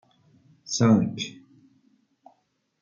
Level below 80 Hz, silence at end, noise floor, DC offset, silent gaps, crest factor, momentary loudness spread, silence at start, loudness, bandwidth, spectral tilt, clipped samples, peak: -68 dBFS; 1.5 s; -70 dBFS; under 0.1%; none; 20 dB; 16 LU; 0.7 s; -24 LUFS; 7.4 kHz; -5.5 dB/octave; under 0.1%; -8 dBFS